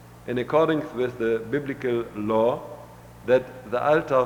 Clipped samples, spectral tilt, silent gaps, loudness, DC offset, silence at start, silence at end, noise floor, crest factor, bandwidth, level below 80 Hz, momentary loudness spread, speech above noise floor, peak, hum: under 0.1%; -7 dB/octave; none; -25 LUFS; under 0.1%; 0 s; 0 s; -44 dBFS; 18 dB; 19.5 kHz; -56 dBFS; 10 LU; 21 dB; -8 dBFS; none